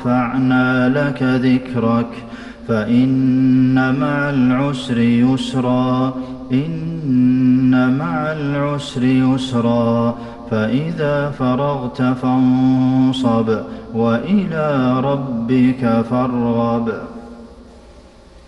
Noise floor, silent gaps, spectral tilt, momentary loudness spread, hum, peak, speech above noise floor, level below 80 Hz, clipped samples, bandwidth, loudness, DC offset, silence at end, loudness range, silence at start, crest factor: -42 dBFS; none; -8 dB/octave; 8 LU; none; -4 dBFS; 26 dB; -46 dBFS; under 0.1%; 9.2 kHz; -16 LUFS; under 0.1%; 0.1 s; 2 LU; 0 s; 12 dB